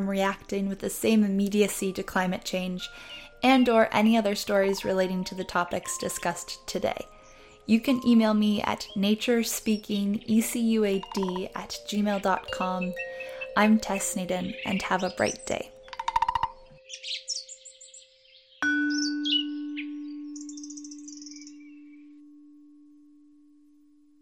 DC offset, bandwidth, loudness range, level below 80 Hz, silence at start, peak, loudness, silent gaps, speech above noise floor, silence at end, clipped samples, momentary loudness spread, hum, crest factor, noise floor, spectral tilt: under 0.1%; 16.5 kHz; 8 LU; -56 dBFS; 0 s; -8 dBFS; -27 LUFS; none; 34 dB; 1.85 s; under 0.1%; 17 LU; none; 20 dB; -60 dBFS; -4.5 dB/octave